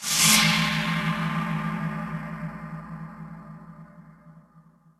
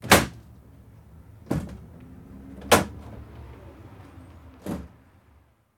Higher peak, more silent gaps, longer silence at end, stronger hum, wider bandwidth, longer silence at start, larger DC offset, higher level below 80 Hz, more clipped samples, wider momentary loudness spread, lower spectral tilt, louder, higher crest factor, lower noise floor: about the same, -4 dBFS vs -2 dBFS; neither; second, 0.4 s vs 0.9 s; neither; second, 13.5 kHz vs 19.5 kHz; about the same, 0 s vs 0.05 s; neither; second, -54 dBFS vs -46 dBFS; neither; about the same, 25 LU vs 26 LU; about the same, -2.5 dB/octave vs -3.5 dB/octave; about the same, -23 LUFS vs -24 LUFS; about the same, 24 dB vs 28 dB; about the same, -56 dBFS vs -59 dBFS